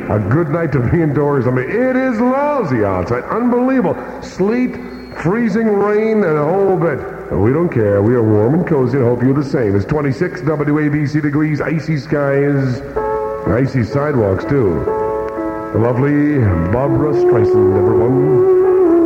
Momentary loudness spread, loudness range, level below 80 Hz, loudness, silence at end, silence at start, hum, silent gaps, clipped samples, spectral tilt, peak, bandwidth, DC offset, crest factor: 7 LU; 3 LU; -40 dBFS; -15 LUFS; 0 s; 0 s; none; none; under 0.1%; -9.5 dB/octave; -2 dBFS; 8 kHz; under 0.1%; 12 dB